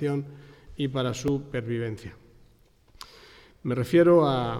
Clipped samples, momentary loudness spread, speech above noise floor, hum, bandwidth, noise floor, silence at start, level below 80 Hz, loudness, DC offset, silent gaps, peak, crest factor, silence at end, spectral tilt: under 0.1%; 26 LU; 34 dB; none; 14.5 kHz; -59 dBFS; 0 s; -54 dBFS; -25 LUFS; under 0.1%; none; -10 dBFS; 18 dB; 0 s; -7 dB/octave